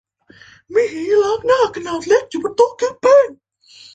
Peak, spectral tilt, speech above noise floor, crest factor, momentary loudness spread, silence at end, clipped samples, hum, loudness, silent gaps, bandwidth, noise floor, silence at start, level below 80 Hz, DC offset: -2 dBFS; -3.5 dB/octave; 31 dB; 16 dB; 9 LU; 0.6 s; under 0.1%; none; -16 LUFS; none; 9 kHz; -46 dBFS; 0.7 s; -58 dBFS; under 0.1%